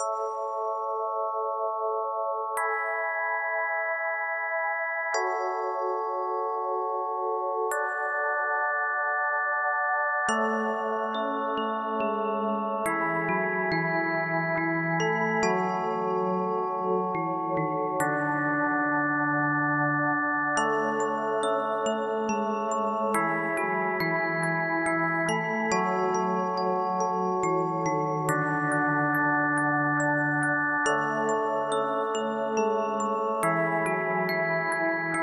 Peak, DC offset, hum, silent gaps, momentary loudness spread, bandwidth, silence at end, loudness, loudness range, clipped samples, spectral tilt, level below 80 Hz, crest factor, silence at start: -12 dBFS; under 0.1%; none; none; 4 LU; 13 kHz; 0 s; -27 LUFS; 3 LU; under 0.1%; -5.5 dB/octave; -72 dBFS; 14 dB; 0 s